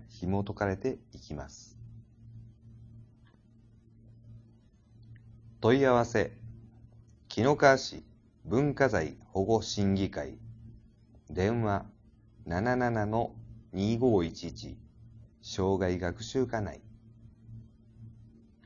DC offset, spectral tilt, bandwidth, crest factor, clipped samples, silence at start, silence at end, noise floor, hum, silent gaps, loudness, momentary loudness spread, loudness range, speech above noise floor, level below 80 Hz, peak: under 0.1%; -6 dB/octave; 7.6 kHz; 24 dB; under 0.1%; 0 s; 0.55 s; -60 dBFS; none; none; -30 LUFS; 26 LU; 9 LU; 31 dB; -54 dBFS; -8 dBFS